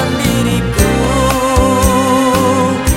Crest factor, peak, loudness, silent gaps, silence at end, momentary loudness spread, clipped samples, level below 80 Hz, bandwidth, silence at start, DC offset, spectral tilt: 12 dB; 0 dBFS; -12 LUFS; none; 0 s; 3 LU; under 0.1%; -22 dBFS; 17 kHz; 0 s; under 0.1%; -5 dB/octave